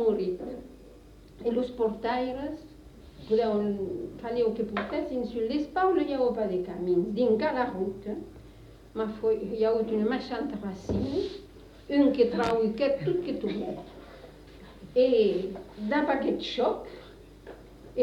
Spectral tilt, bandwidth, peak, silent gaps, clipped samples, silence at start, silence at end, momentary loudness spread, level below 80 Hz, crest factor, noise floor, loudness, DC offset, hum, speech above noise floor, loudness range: -7 dB/octave; 10.5 kHz; -12 dBFS; none; under 0.1%; 0 s; 0 s; 21 LU; -54 dBFS; 18 dB; -51 dBFS; -29 LUFS; under 0.1%; none; 23 dB; 3 LU